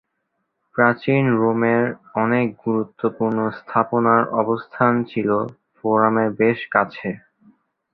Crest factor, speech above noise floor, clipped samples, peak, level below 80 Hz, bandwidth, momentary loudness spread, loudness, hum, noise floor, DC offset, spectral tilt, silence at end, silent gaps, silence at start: 18 dB; 55 dB; under 0.1%; -2 dBFS; -62 dBFS; 5 kHz; 8 LU; -20 LUFS; none; -74 dBFS; under 0.1%; -10.5 dB/octave; 0.75 s; none; 0.75 s